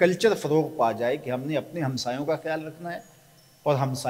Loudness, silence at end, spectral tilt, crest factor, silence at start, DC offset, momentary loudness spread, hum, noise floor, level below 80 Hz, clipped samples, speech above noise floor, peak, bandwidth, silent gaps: -27 LUFS; 0 s; -5.5 dB/octave; 20 dB; 0 s; under 0.1%; 12 LU; none; -56 dBFS; -68 dBFS; under 0.1%; 30 dB; -6 dBFS; 16 kHz; none